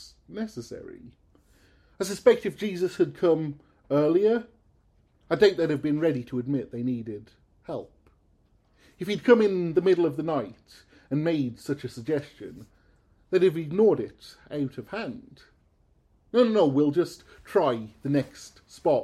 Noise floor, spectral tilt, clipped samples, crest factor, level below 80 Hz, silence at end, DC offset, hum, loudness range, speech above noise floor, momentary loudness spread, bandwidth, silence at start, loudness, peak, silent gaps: -64 dBFS; -6.5 dB/octave; under 0.1%; 20 dB; -62 dBFS; 0 s; under 0.1%; none; 4 LU; 39 dB; 18 LU; 14 kHz; 0 s; -26 LUFS; -6 dBFS; none